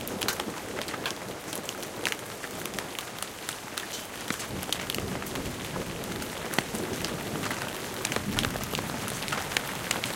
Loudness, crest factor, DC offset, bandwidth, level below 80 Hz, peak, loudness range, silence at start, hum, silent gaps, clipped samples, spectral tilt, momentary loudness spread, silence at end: -32 LUFS; 28 dB; under 0.1%; 17 kHz; -52 dBFS; -6 dBFS; 3 LU; 0 s; none; none; under 0.1%; -3 dB/octave; 6 LU; 0 s